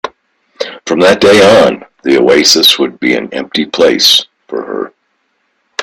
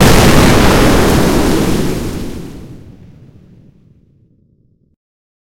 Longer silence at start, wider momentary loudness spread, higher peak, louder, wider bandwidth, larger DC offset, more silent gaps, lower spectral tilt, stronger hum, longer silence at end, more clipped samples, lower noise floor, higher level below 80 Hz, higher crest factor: about the same, 0.05 s vs 0 s; second, 17 LU vs 20 LU; about the same, 0 dBFS vs 0 dBFS; about the same, -8 LUFS vs -10 LUFS; first, over 20 kHz vs 17 kHz; neither; neither; second, -2.5 dB/octave vs -5 dB/octave; neither; second, 0 s vs 2.65 s; about the same, 0.4% vs 0.4%; first, -61 dBFS vs -53 dBFS; second, -48 dBFS vs -22 dBFS; about the same, 10 dB vs 12 dB